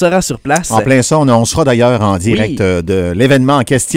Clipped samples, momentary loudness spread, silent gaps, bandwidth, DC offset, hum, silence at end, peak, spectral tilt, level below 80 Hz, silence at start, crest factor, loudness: 0.2%; 5 LU; none; 16.5 kHz; under 0.1%; none; 0 s; 0 dBFS; -5 dB/octave; -36 dBFS; 0 s; 10 dB; -11 LUFS